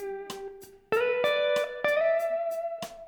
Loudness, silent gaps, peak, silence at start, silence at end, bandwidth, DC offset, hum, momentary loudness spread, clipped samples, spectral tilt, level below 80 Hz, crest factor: -28 LUFS; none; -12 dBFS; 0 s; 0 s; over 20 kHz; under 0.1%; none; 13 LU; under 0.1%; -3 dB/octave; -66 dBFS; 18 dB